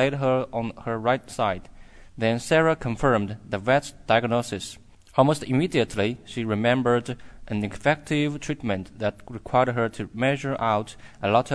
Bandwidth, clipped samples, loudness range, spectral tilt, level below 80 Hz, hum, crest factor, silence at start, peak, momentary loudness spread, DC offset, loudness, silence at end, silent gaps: 11 kHz; under 0.1%; 2 LU; -6 dB/octave; -48 dBFS; none; 20 dB; 0 s; -6 dBFS; 9 LU; under 0.1%; -25 LUFS; 0 s; none